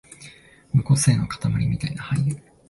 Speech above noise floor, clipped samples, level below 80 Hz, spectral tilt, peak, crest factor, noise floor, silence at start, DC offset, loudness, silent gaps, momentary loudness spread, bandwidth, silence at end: 26 dB; under 0.1%; -44 dBFS; -5.5 dB/octave; -6 dBFS; 18 dB; -48 dBFS; 0.1 s; under 0.1%; -22 LUFS; none; 9 LU; 12 kHz; 0.3 s